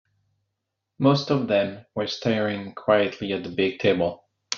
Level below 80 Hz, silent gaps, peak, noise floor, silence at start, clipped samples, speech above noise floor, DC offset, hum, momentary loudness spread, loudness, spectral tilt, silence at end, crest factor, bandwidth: -64 dBFS; none; -4 dBFS; -81 dBFS; 1 s; under 0.1%; 58 dB; under 0.1%; none; 8 LU; -24 LUFS; -4.5 dB/octave; 0 s; 20 dB; 7.2 kHz